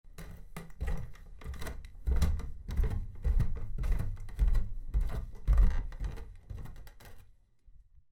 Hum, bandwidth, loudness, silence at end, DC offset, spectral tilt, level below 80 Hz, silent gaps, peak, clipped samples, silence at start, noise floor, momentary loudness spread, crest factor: none; 14.5 kHz; -36 LUFS; 0.35 s; under 0.1%; -7 dB/octave; -32 dBFS; none; -14 dBFS; under 0.1%; 0.05 s; -59 dBFS; 17 LU; 18 dB